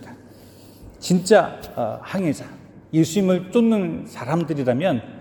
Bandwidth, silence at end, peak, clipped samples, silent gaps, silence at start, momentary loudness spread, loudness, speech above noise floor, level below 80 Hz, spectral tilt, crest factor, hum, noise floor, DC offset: 18 kHz; 0 s; -2 dBFS; under 0.1%; none; 0 s; 11 LU; -21 LUFS; 25 dB; -56 dBFS; -6 dB/octave; 20 dB; none; -45 dBFS; under 0.1%